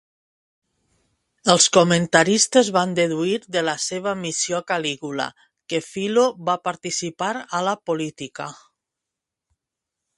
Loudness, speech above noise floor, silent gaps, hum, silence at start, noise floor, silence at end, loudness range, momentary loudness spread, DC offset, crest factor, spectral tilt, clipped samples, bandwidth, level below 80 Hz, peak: -21 LUFS; 64 dB; none; none; 1.45 s; -85 dBFS; 1.65 s; 9 LU; 12 LU; under 0.1%; 22 dB; -3 dB/octave; under 0.1%; 11.5 kHz; -66 dBFS; 0 dBFS